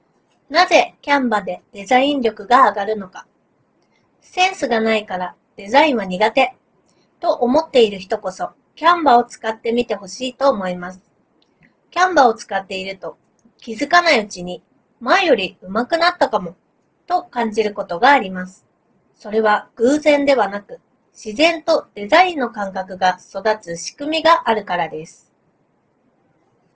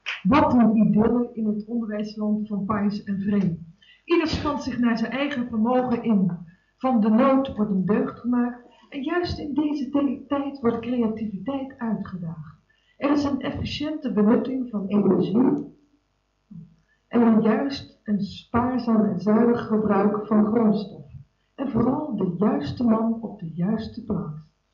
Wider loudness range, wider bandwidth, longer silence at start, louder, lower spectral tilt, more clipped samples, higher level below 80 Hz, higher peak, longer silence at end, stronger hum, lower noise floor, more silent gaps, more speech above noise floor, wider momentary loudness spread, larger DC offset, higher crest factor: about the same, 3 LU vs 4 LU; first, 8 kHz vs 6.8 kHz; first, 0.5 s vs 0.05 s; first, -17 LUFS vs -23 LUFS; second, -4 dB/octave vs -8 dB/octave; neither; second, -58 dBFS vs -52 dBFS; first, 0 dBFS vs -8 dBFS; first, 1.65 s vs 0.3 s; neither; second, -62 dBFS vs -70 dBFS; neither; about the same, 45 dB vs 48 dB; first, 16 LU vs 11 LU; neither; about the same, 18 dB vs 16 dB